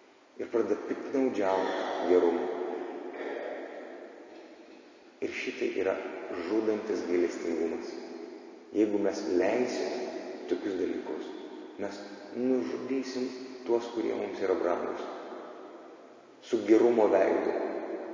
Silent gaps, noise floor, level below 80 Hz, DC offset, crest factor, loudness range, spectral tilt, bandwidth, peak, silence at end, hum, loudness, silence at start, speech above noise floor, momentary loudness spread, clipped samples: none; -54 dBFS; -72 dBFS; under 0.1%; 20 dB; 6 LU; -5 dB/octave; 7.6 kHz; -10 dBFS; 0 s; none; -31 LUFS; 0.35 s; 24 dB; 18 LU; under 0.1%